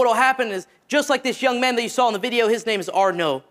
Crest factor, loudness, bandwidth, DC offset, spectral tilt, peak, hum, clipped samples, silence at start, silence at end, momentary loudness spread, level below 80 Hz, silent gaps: 16 dB; -20 LUFS; 16 kHz; under 0.1%; -3 dB/octave; -4 dBFS; none; under 0.1%; 0 s; 0.1 s; 5 LU; -72 dBFS; none